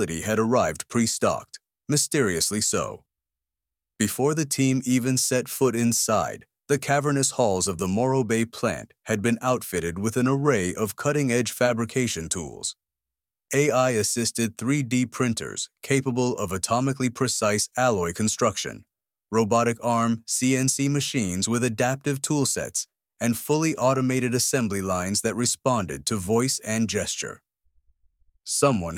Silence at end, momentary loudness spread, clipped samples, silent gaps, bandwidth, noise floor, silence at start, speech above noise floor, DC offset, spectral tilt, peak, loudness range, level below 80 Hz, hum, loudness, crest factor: 0 s; 7 LU; under 0.1%; none; 17 kHz; -90 dBFS; 0 s; 66 dB; under 0.1%; -4 dB/octave; -6 dBFS; 2 LU; -56 dBFS; none; -24 LUFS; 18 dB